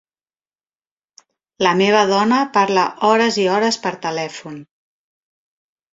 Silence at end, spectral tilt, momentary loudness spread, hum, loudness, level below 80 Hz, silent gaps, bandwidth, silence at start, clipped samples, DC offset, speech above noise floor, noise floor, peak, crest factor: 1.3 s; -4 dB/octave; 13 LU; none; -16 LUFS; -64 dBFS; none; 7.8 kHz; 1.6 s; under 0.1%; under 0.1%; over 74 dB; under -90 dBFS; 0 dBFS; 18 dB